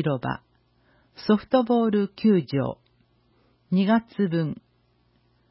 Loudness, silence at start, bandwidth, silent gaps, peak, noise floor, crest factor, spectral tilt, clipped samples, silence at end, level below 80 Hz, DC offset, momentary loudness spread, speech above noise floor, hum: -24 LUFS; 0 s; 5.8 kHz; none; -8 dBFS; -65 dBFS; 18 dB; -11.5 dB/octave; under 0.1%; 0.95 s; -60 dBFS; under 0.1%; 11 LU; 42 dB; 60 Hz at -50 dBFS